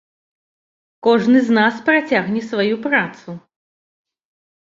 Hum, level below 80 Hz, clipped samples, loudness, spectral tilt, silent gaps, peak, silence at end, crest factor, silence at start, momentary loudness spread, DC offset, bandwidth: none; -64 dBFS; under 0.1%; -16 LUFS; -6 dB/octave; none; -2 dBFS; 1.35 s; 18 dB; 1.05 s; 17 LU; under 0.1%; 7.6 kHz